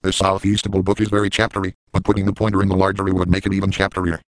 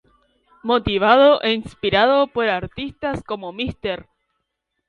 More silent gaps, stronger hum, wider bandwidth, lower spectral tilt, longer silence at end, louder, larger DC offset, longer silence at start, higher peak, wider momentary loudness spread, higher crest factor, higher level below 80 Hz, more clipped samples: first, 1.75-1.87 s vs none; neither; first, 10.5 kHz vs 8.6 kHz; about the same, -5.5 dB/octave vs -6.5 dB/octave; second, 0.2 s vs 0.85 s; about the same, -19 LUFS vs -19 LUFS; neither; second, 0.05 s vs 0.65 s; about the same, 0 dBFS vs 0 dBFS; second, 3 LU vs 15 LU; about the same, 18 dB vs 20 dB; first, -36 dBFS vs -46 dBFS; neither